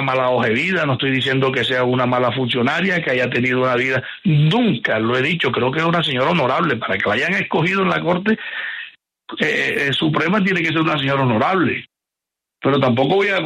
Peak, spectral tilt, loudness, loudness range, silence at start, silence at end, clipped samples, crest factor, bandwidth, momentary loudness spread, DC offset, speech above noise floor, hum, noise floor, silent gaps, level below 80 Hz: -4 dBFS; -6.5 dB/octave; -17 LUFS; 2 LU; 0 s; 0 s; under 0.1%; 14 dB; 12.5 kHz; 4 LU; under 0.1%; 67 dB; none; -85 dBFS; none; -56 dBFS